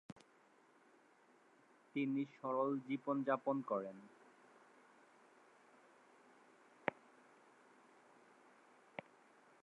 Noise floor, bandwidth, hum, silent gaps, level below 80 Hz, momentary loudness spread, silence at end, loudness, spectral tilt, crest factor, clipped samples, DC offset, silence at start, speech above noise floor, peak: -70 dBFS; 9.8 kHz; none; 0.12-0.16 s; under -90 dBFS; 27 LU; 2.7 s; -42 LUFS; -7.5 dB/octave; 30 dB; under 0.1%; under 0.1%; 0.1 s; 30 dB; -18 dBFS